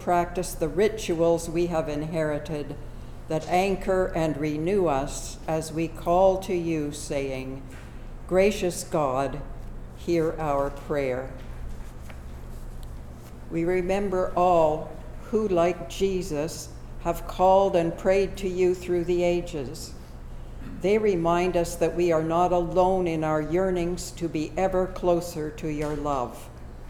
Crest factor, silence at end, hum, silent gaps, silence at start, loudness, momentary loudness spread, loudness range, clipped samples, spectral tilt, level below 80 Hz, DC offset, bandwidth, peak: 18 dB; 0 s; none; none; 0 s; -26 LUFS; 19 LU; 5 LU; under 0.1%; -6 dB/octave; -40 dBFS; under 0.1%; 17 kHz; -8 dBFS